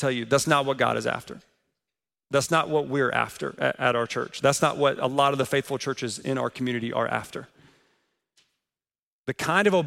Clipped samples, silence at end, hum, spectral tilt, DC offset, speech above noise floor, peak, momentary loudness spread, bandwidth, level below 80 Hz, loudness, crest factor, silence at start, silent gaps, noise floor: under 0.1%; 0 s; none; -4.5 dB/octave; under 0.1%; over 65 dB; -6 dBFS; 9 LU; 16 kHz; -64 dBFS; -25 LUFS; 20 dB; 0 s; 8.99-9.24 s; under -90 dBFS